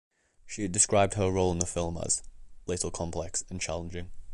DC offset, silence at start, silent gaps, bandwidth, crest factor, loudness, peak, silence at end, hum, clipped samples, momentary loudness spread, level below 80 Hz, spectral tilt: under 0.1%; 0.45 s; none; 11.5 kHz; 22 dB; -29 LUFS; -8 dBFS; 0 s; none; under 0.1%; 15 LU; -46 dBFS; -4 dB/octave